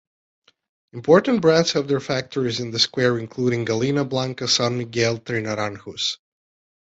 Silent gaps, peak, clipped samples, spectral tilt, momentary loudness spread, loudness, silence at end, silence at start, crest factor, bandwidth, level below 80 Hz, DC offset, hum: none; -2 dBFS; under 0.1%; -4.5 dB/octave; 9 LU; -21 LUFS; 0.65 s; 0.95 s; 20 dB; 8 kHz; -60 dBFS; under 0.1%; none